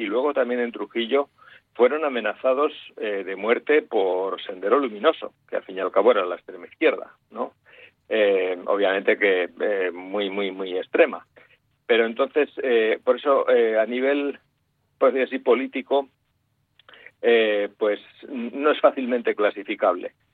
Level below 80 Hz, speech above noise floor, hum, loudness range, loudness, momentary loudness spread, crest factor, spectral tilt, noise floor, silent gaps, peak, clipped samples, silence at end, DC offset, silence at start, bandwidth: -76 dBFS; 47 dB; none; 3 LU; -23 LUFS; 12 LU; 20 dB; -7 dB/octave; -70 dBFS; none; -4 dBFS; under 0.1%; 0.25 s; under 0.1%; 0 s; 4.2 kHz